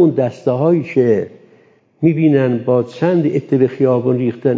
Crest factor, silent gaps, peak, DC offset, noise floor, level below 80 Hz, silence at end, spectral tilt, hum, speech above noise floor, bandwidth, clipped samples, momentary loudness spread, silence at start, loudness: 14 dB; none; -2 dBFS; under 0.1%; -51 dBFS; -58 dBFS; 0 s; -9.5 dB/octave; none; 36 dB; 7.6 kHz; under 0.1%; 4 LU; 0 s; -15 LUFS